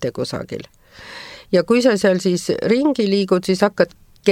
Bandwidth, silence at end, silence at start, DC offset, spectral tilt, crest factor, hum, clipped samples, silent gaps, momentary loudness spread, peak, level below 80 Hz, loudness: 16 kHz; 0 s; 0 s; under 0.1%; -5.5 dB/octave; 18 dB; none; under 0.1%; none; 18 LU; -2 dBFS; -54 dBFS; -18 LUFS